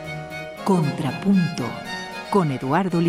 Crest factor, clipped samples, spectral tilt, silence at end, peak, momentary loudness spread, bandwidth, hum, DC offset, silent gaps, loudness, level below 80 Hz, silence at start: 16 dB; under 0.1%; -7 dB/octave; 0 s; -6 dBFS; 11 LU; 14.5 kHz; none; under 0.1%; none; -23 LUFS; -56 dBFS; 0 s